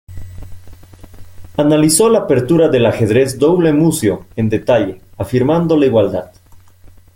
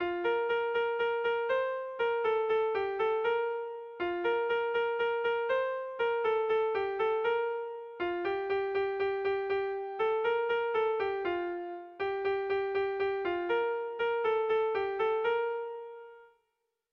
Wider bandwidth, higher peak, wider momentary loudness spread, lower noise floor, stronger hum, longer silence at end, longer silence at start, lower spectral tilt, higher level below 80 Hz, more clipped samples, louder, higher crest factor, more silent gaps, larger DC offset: first, 17 kHz vs 5.6 kHz; first, 0 dBFS vs -20 dBFS; first, 12 LU vs 6 LU; second, -41 dBFS vs -82 dBFS; neither; second, 0.3 s vs 0.65 s; about the same, 0.1 s vs 0 s; about the same, -5.5 dB/octave vs -6 dB/octave; first, -42 dBFS vs -68 dBFS; neither; first, -13 LUFS vs -31 LUFS; about the same, 14 dB vs 12 dB; neither; neither